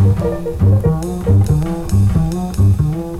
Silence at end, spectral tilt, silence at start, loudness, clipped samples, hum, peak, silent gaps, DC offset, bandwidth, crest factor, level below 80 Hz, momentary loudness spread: 0 s; -8.5 dB/octave; 0 s; -15 LUFS; under 0.1%; none; -4 dBFS; none; 0.3%; 13 kHz; 10 dB; -26 dBFS; 5 LU